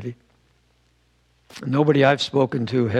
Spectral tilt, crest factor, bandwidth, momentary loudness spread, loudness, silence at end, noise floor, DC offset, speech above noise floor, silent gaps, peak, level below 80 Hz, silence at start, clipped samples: -6.5 dB/octave; 18 dB; 10.5 kHz; 15 LU; -20 LUFS; 0 s; -62 dBFS; under 0.1%; 43 dB; none; -4 dBFS; -64 dBFS; 0 s; under 0.1%